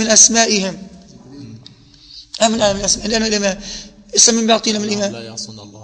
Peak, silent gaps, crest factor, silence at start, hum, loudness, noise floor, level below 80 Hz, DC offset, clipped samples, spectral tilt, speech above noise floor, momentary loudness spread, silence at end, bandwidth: 0 dBFS; none; 18 dB; 0 s; none; -14 LUFS; -43 dBFS; -44 dBFS; under 0.1%; under 0.1%; -1.5 dB/octave; 28 dB; 20 LU; 0 s; 10.5 kHz